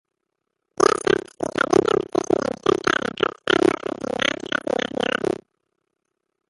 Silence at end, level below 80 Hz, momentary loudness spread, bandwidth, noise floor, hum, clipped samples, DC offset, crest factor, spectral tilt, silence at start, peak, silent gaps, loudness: 1.2 s; -54 dBFS; 8 LU; 11.5 kHz; -79 dBFS; none; under 0.1%; under 0.1%; 22 dB; -4 dB/octave; 0.8 s; -2 dBFS; none; -22 LUFS